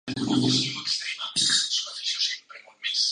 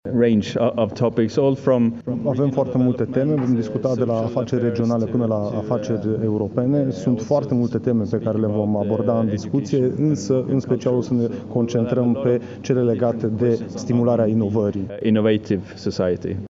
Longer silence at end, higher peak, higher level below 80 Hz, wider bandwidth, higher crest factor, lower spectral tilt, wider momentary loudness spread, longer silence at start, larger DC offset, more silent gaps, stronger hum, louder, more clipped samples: about the same, 0 s vs 0 s; second, -10 dBFS vs -4 dBFS; second, -64 dBFS vs -56 dBFS; first, 11.5 kHz vs 7.6 kHz; about the same, 18 dB vs 14 dB; second, -2 dB/octave vs -8 dB/octave; about the same, 7 LU vs 5 LU; about the same, 0.05 s vs 0.05 s; neither; neither; neither; second, -24 LUFS vs -21 LUFS; neither